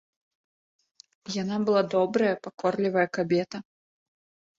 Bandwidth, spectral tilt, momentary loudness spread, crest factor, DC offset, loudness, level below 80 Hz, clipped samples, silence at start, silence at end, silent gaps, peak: 7.8 kHz; -6 dB/octave; 12 LU; 18 dB; under 0.1%; -26 LUFS; -72 dBFS; under 0.1%; 1.25 s; 0.95 s; none; -10 dBFS